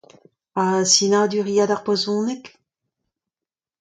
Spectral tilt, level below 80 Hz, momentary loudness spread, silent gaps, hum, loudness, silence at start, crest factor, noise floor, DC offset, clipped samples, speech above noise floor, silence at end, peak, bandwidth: -3 dB/octave; -70 dBFS; 12 LU; none; none; -19 LUFS; 0.55 s; 20 dB; under -90 dBFS; under 0.1%; under 0.1%; over 71 dB; 1.35 s; -2 dBFS; 9.4 kHz